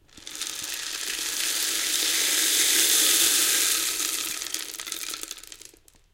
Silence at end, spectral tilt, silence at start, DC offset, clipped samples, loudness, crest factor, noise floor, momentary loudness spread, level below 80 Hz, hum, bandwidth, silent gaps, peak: 0.5 s; 2.5 dB/octave; 0.15 s; under 0.1%; under 0.1%; -22 LUFS; 22 dB; -53 dBFS; 15 LU; -62 dBFS; none; 17 kHz; none; -4 dBFS